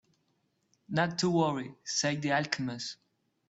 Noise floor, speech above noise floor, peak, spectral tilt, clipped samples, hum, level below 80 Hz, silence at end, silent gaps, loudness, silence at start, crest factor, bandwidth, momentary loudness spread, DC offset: -76 dBFS; 45 dB; -10 dBFS; -4 dB/octave; under 0.1%; none; -72 dBFS; 0.55 s; none; -31 LUFS; 0.9 s; 22 dB; 8.2 kHz; 11 LU; under 0.1%